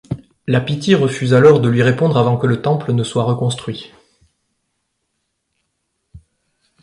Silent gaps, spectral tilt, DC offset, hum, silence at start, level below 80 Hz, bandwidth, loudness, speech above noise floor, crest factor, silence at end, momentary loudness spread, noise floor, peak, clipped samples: none; -7 dB/octave; under 0.1%; none; 0.1 s; -50 dBFS; 11.5 kHz; -15 LUFS; 57 dB; 16 dB; 0.65 s; 15 LU; -72 dBFS; 0 dBFS; under 0.1%